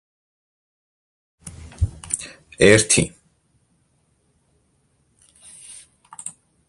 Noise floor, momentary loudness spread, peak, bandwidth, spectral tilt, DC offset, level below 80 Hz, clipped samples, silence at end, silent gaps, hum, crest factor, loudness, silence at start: -65 dBFS; 28 LU; 0 dBFS; 11.5 kHz; -3.5 dB/octave; under 0.1%; -40 dBFS; under 0.1%; 0.4 s; none; none; 26 dB; -18 LUFS; 1.45 s